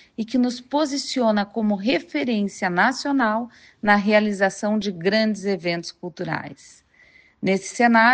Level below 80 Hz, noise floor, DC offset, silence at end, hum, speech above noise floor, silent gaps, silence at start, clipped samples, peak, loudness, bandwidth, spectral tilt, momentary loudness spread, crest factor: -62 dBFS; -54 dBFS; under 0.1%; 0 s; none; 33 dB; none; 0.2 s; under 0.1%; -4 dBFS; -22 LUFS; 9.4 kHz; -5 dB/octave; 10 LU; 18 dB